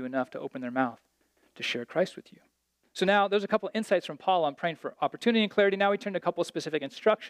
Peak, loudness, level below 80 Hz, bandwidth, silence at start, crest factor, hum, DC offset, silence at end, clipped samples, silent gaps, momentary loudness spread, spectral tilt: -10 dBFS; -29 LUFS; -80 dBFS; 14 kHz; 0 s; 20 dB; none; under 0.1%; 0 s; under 0.1%; none; 9 LU; -5 dB/octave